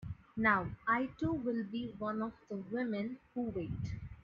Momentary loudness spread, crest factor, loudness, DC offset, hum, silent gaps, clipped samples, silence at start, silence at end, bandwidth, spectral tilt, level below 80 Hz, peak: 11 LU; 22 dB; -37 LUFS; under 0.1%; none; none; under 0.1%; 0 s; 0.05 s; 7 kHz; -5.5 dB/octave; -58 dBFS; -16 dBFS